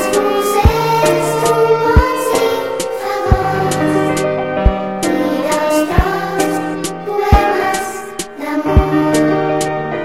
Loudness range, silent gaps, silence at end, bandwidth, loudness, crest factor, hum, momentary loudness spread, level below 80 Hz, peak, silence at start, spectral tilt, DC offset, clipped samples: 2 LU; none; 0 s; 16.5 kHz; -15 LUFS; 14 dB; none; 7 LU; -22 dBFS; 0 dBFS; 0 s; -5.5 dB/octave; 0.7%; under 0.1%